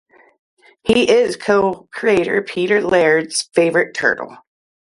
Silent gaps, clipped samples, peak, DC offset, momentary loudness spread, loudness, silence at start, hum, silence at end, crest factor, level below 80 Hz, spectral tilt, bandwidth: none; under 0.1%; 0 dBFS; under 0.1%; 7 LU; -16 LUFS; 0.85 s; none; 0.55 s; 16 dB; -52 dBFS; -4 dB/octave; 11.5 kHz